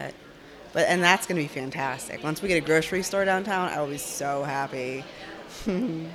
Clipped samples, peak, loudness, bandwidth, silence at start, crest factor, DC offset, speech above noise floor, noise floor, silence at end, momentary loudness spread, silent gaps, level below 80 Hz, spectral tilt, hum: under 0.1%; -2 dBFS; -26 LUFS; 17 kHz; 0 s; 24 dB; under 0.1%; 21 dB; -47 dBFS; 0 s; 15 LU; none; -56 dBFS; -4 dB/octave; none